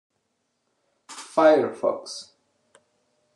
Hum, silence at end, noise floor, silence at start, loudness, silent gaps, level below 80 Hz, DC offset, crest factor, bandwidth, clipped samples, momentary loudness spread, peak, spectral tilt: none; 1.15 s; -75 dBFS; 1.1 s; -22 LUFS; none; -84 dBFS; under 0.1%; 20 dB; 11 kHz; under 0.1%; 22 LU; -6 dBFS; -4 dB/octave